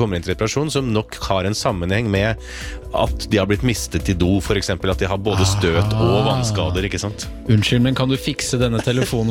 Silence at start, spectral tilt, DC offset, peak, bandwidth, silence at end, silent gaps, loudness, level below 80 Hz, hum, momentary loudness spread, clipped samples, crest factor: 0 s; -5.5 dB/octave; under 0.1%; -4 dBFS; 17 kHz; 0 s; none; -19 LUFS; -32 dBFS; none; 6 LU; under 0.1%; 14 dB